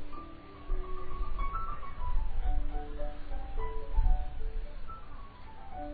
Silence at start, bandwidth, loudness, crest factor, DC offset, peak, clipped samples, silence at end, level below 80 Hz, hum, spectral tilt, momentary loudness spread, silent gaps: 0 s; 4.4 kHz; -40 LUFS; 16 dB; under 0.1%; -14 dBFS; under 0.1%; 0 s; -32 dBFS; none; -9.5 dB/octave; 13 LU; none